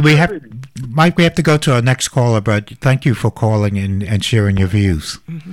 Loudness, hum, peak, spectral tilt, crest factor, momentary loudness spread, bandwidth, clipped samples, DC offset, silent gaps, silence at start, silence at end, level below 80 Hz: -15 LUFS; none; -2 dBFS; -6 dB/octave; 12 dB; 10 LU; 15 kHz; under 0.1%; 0.4%; none; 0 s; 0 s; -38 dBFS